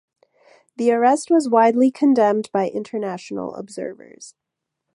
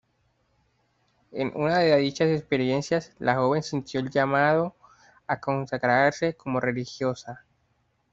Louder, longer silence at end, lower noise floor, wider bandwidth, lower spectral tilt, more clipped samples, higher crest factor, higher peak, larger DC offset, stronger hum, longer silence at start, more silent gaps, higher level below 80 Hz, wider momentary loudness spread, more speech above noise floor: first, -19 LUFS vs -25 LUFS; about the same, 0.65 s vs 0.75 s; first, -79 dBFS vs -70 dBFS; first, 11.5 kHz vs 7.8 kHz; about the same, -5.5 dB/octave vs -6 dB/octave; neither; about the same, 18 dB vs 20 dB; first, -2 dBFS vs -6 dBFS; neither; neither; second, 0.8 s vs 1.35 s; neither; second, -72 dBFS vs -64 dBFS; first, 15 LU vs 11 LU; first, 61 dB vs 45 dB